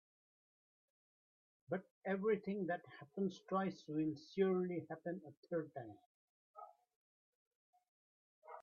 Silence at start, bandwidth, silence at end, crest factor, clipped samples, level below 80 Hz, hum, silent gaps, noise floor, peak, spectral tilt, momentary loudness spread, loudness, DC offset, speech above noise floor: 1.7 s; 7 kHz; 0 s; 20 dB; under 0.1%; -86 dBFS; none; 1.91-2.01 s, 5.37-5.43 s, 6.06-6.54 s, 6.96-7.73 s, 7.89-8.42 s; under -90 dBFS; -24 dBFS; -6.5 dB/octave; 19 LU; -42 LUFS; under 0.1%; over 48 dB